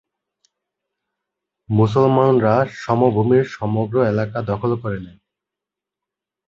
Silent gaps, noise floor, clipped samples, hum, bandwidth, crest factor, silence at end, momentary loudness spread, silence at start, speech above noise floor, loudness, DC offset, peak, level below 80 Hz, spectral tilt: none; -86 dBFS; under 0.1%; 50 Hz at -55 dBFS; 7.4 kHz; 18 dB; 1.4 s; 8 LU; 1.7 s; 69 dB; -18 LUFS; under 0.1%; -2 dBFS; -52 dBFS; -9 dB/octave